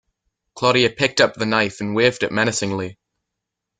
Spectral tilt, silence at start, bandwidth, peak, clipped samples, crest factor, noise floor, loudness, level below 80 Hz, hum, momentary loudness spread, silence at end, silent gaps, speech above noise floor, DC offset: -4 dB/octave; 0.55 s; 9.6 kHz; 0 dBFS; under 0.1%; 20 dB; -82 dBFS; -19 LUFS; -56 dBFS; none; 8 LU; 0.85 s; none; 63 dB; under 0.1%